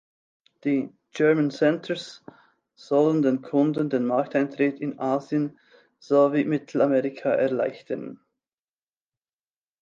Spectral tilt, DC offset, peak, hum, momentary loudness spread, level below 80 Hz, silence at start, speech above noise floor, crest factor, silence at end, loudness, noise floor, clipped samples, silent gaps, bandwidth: -7.5 dB/octave; under 0.1%; -8 dBFS; none; 11 LU; -78 dBFS; 0.65 s; over 66 dB; 18 dB; 1.65 s; -24 LUFS; under -90 dBFS; under 0.1%; none; 7.6 kHz